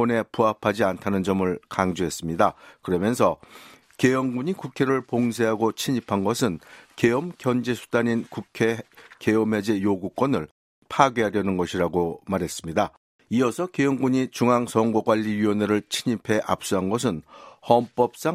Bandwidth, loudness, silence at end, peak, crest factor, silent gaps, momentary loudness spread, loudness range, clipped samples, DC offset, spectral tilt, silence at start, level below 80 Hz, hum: 16 kHz; -24 LUFS; 0 s; 0 dBFS; 22 dB; 10.51-10.82 s, 12.97-13.19 s; 7 LU; 2 LU; under 0.1%; under 0.1%; -5.5 dB/octave; 0 s; -58 dBFS; none